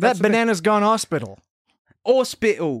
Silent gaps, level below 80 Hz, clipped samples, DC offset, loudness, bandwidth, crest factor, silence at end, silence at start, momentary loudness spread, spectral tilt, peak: 1.51-1.65 s, 1.79-1.85 s; -60 dBFS; under 0.1%; under 0.1%; -20 LUFS; 15 kHz; 18 dB; 0 s; 0 s; 10 LU; -4.5 dB/octave; -2 dBFS